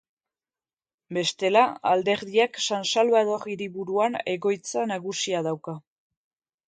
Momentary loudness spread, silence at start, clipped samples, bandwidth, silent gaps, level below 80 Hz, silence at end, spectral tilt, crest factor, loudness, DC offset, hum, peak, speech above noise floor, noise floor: 11 LU; 1.1 s; under 0.1%; 9.4 kHz; none; -74 dBFS; 0.9 s; -3.5 dB/octave; 22 dB; -25 LUFS; under 0.1%; none; -4 dBFS; over 65 dB; under -90 dBFS